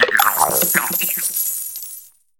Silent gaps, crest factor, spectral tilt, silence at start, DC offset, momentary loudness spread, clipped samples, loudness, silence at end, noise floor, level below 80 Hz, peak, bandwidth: none; 20 dB; -0.5 dB/octave; 0 s; under 0.1%; 15 LU; under 0.1%; -16 LUFS; 0.3 s; -40 dBFS; -60 dBFS; 0 dBFS; 19 kHz